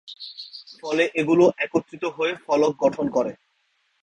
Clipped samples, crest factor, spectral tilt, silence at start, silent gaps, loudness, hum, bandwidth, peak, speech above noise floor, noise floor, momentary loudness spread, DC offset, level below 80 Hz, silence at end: under 0.1%; 18 dB; -5.5 dB/octave; 0.05 s; none; -22 LUFS; none; 9.4 kHz; -4 dBFS; 47 dB; -69 dBFS; 18 LU; under 0.1%; -66 dBFS; 0.7 s